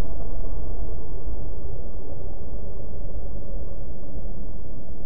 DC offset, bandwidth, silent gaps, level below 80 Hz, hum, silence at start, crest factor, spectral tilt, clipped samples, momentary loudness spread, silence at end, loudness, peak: 20%; 1.6 kHz; none; -34 dBFS; none; 0 s; 12 dB; -12 dB/octave; under 0.1%; 4 LU; 0 s; -37 LUFS; -10 dBFS